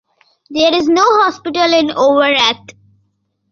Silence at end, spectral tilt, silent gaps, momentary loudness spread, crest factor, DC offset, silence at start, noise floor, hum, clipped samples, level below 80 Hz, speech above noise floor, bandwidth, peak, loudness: 0.8 s; -2.5 dB/octave; none; 5 LU; 14 dB; under 0.1%; 0.5 s; -64 dBFS; none; under 0.1%; -56 dBFS; 52 dB; 7.4 kHz; 0 dBFS; -12 LUFS